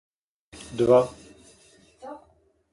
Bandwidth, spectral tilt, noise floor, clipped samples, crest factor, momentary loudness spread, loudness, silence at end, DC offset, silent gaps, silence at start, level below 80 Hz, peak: 11.5 kHz; -6.5 dB/octave; -62 dBFS; under 0.1%; 22 dB; 26 LU; -22 LUFS; 0.55 s; under 0.1%; none; 0.7 s; -58 dBFS; -6 dBFS